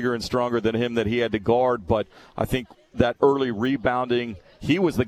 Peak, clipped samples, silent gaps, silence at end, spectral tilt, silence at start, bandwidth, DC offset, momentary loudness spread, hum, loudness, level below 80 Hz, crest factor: -4 dBFS; under 0.1%; none; 0 s; -6.5 dB/octave; 0 s; 14 kHz; under 0.1%; 9 LU; none; -23 LUFS; -46 dBFS; 20 dB